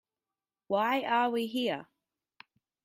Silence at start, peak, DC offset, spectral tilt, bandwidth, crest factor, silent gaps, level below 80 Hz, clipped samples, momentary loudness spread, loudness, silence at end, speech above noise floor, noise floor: 0.7 s; -16 dBFS; under 0.1%; -5 dB/octave; 16 kHz; 16 dB; none; -82 dBFS; under 0.1%; 6 LU; -30 LUFS; 1 s; over 60 dB; under -90 dBFS